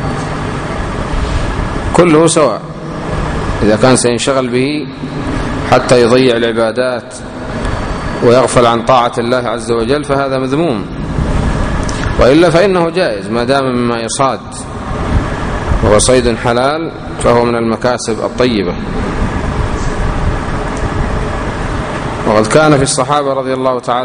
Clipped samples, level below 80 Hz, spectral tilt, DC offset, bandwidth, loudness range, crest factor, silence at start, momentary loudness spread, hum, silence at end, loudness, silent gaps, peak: 0.3%; -24 dBFS; -5 dB/octave; under 0.1%; 10.5 kHz; 4 LU; 12 dB; 0 s; 11 LU; none; 0 s; -13 LUFS; none; 0 dBFS